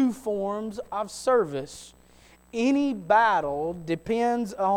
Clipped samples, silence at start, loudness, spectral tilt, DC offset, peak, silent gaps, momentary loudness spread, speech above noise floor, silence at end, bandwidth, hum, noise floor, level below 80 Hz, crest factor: under 0.1%; 0 s; -26 LUFS; -5.5 dB/octave; under 0.1%; -8 dBFS; none; 12 LU; 30 dB; 0 s; 16.5 kHz; 60 Hz at -60 dBFS; -55 dBFS; -58 dBFS; 18 dB